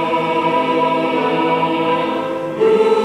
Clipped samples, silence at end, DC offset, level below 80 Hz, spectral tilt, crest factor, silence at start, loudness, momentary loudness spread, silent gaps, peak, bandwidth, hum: under 0.1%; 0 s; under 0.1%; -58 dBFS; -6 dB/octave; 12 dB; 0 s; -16 LUFS; 5 LU; none; -4 dBFS; 11.5 kHz; none